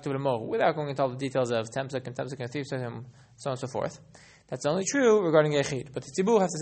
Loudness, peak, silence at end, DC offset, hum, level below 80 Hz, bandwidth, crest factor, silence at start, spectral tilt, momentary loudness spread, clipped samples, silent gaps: -28 LUFS; -8 dBFS; 0 s; under 0.1%; none; -66 dBFS; 8.8 kHz; 20 dB; 0 s; -5 dB/octave; 13 LU; under 0.1%; none